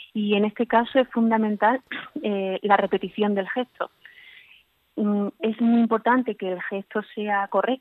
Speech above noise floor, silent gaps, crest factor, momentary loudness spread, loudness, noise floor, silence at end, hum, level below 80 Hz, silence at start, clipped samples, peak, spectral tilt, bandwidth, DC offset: 34 dB; none; 20 dB; 10 LU; -24 LUFS; -57 dBFS; 0.05 s; none; -70 dBFS; 0 s; under 0.1%; -4 dBFS; -8.5 dB/octave; 4.2 kHz; under 0.1%